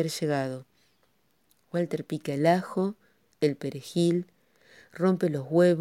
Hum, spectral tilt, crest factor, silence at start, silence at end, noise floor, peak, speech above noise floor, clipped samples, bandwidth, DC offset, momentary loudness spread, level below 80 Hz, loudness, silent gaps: none; -6.5 dB/octave; 18 dB; 0 s; 0 s; -70 dBFS; -10 dBFS; 44 dB; under 0.1%; 15.5 kHz; under 0.1%; 11 LU; -76 dBFS; -28 LUFS; none